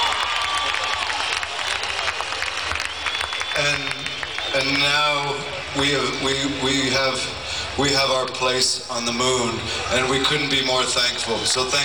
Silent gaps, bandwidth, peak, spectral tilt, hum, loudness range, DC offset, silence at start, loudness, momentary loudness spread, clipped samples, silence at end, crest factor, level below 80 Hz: none; 19 kHz; -6 dBFS; -2 dB/octave; none; 3 LU; 0.4%; 0 s; -21 LUFS; 6 LU; under 0.1%; 0 s; 16 dB; -46 dBFS